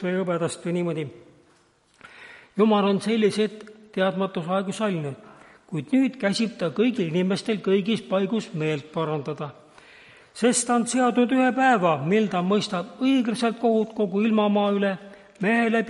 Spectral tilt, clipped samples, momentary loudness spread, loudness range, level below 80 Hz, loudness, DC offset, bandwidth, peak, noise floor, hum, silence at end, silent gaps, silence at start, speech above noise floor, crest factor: -5 dB/octave; under 0.1%; 13 LU; 4 LU; -72 dBFS; -23 LUFS; under 0.1%; 11.5 kHz; -8 dBFS; -61 dBFS; none; 0 s; none; 0 s; 38 dB; 16 dB